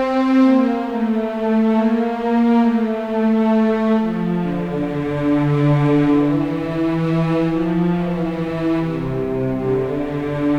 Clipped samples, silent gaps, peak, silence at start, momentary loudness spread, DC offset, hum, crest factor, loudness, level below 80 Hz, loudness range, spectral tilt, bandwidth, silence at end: under 0.1%; none; -4 dBFS; 0 s; 7 LU; under 0.1%; none; 12 dB; -18 LUFS; -42 dBFS; 3 LU; -9 dB/octave; 7.4 kHz; 0 s